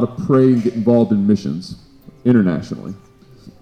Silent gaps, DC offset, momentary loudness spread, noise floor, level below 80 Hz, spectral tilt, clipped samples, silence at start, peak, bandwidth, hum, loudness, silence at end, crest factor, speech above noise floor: none; under 0.1%; 16 LU; -43 dBFS; -50 dBFS; -9 dB/octave; under 0.1%; 0 s; -2 dBFS; 9 kHz; none; -16 LUFS; 0.1 s; 14 dB; 27 dB